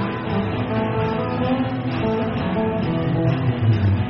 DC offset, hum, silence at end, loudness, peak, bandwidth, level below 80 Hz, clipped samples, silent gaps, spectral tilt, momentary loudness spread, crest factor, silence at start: under 0.1%; none; 0 s; -22 LUFS; -8 dBFS; 5.8 kHz; -40 dBFS; under 0.1%; none; -7 dB/octave; 4 LU; 14 dB; 0 s